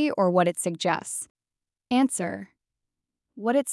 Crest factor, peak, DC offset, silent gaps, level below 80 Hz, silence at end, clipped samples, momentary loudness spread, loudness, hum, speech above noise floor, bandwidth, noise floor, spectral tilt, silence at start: 18 dB; -8 dBFS; under 0.1%; 1.30-1.35 s; -76 dBFS; 0 s; under 0.1%; 11 LU; -26 LUFS; none; over 65 dB; 12 kHz; under -90 dBFS; -4.5 dB/octave; 0 s